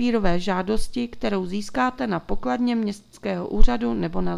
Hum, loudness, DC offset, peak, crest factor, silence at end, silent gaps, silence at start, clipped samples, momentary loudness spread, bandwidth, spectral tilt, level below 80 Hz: none; -25 LUFS; under 0.1%; 0 dBFS; 20 dB; 0 s; none; 0 s; under 0.1%; 6 LU; 11 kHz; -6 dB/octave; -30 dBFS